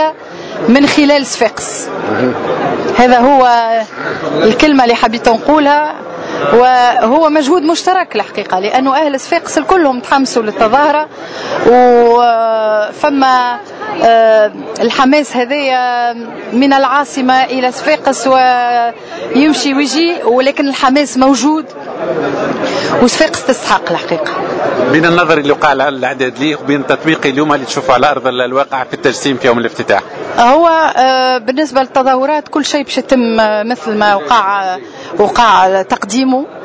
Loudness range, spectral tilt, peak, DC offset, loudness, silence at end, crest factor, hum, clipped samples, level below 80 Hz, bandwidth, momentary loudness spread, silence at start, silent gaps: 2 LU; -4 dB/octave; 0 dBFS; under 0.1%; -11 LUFS; 0 s; 10 dB; none; 0.5%; -46 dBFS; 8 kHz; 9 LU; 0 s; none